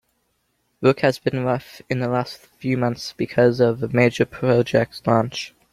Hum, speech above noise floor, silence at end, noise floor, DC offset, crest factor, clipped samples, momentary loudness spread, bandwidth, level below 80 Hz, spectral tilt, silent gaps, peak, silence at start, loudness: none; 49 dB; 0.25 s; -69 dBFS; under 0.1%; 18 dB; under 0.1%; 9 LU; 15 kHz; -56 dBFS; -6.5 dB/octave; none; -2 dBFS; 0.8 s; -21 LUFS